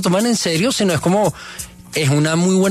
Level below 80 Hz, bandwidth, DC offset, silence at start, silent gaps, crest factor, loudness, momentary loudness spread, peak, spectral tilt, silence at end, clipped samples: -48 dBFS; 14 kHz; under 0.1%; 0 s; none; 12 dB; -16 LUFS; 13 LU; -4 dBFS; -5 dB/octave; 0 s; under 0.1%